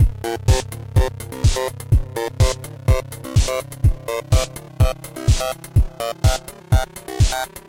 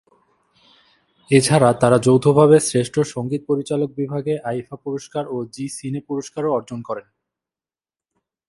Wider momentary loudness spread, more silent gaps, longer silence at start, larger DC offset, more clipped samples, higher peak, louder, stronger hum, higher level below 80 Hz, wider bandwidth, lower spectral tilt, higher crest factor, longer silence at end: second, 5 LU vs 15 LU; neither; second, 0 s vs 1.3 s; neither; neither; second, -4 dBFS vs 0 dBFS; about the same, -21 LUFS vs -19 LUFS; neither; first, -22 dBFS vs -58 dBFS; first, 17 kHz vs 11.5 kHz; about the same, -5 dB/octave vs -6 dB/octave; second, 14 dB vs 20 dB; second, 0.1 s vs 1.5 s